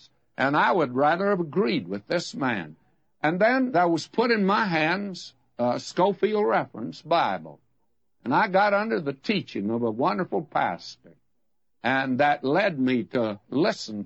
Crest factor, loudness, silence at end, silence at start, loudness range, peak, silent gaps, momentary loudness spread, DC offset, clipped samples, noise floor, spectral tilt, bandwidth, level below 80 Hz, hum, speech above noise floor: 16 dB; -25 LUFS; 0 s; 0.4 s; 3 LU; -8 dBFS; none; 9 LU; under 0.1%; under 0.1%; -80 dBFS; -6 dB/octave; 8.6 kHz; -72 dBFS; none; 56 dB